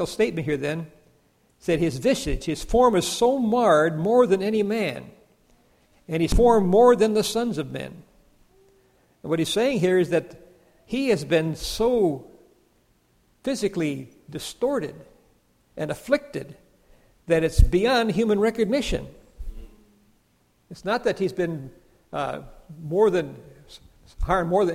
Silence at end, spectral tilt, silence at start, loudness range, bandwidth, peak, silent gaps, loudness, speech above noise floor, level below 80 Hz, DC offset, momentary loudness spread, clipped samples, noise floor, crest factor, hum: 0 s; -5.5 dB/octave; 0 s; 9 LU; 15.5 kHz; -2 dBFS; none; -23 LUFS; 42 dB; -36 dBFS; under 0.1%; 17 LU; under 0.1%; -64 dBFS; 22 dB; none